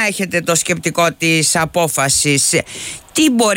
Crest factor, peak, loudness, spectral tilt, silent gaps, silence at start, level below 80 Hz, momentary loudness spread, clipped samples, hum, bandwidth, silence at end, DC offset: 12 dB; -2 dBFS; -14 LUFS; -3 dB/octave; none; 0 s; -48 dBFS; 6 LU; under 0.1%; none; 16.5 kHz; 0 s; under 0.1%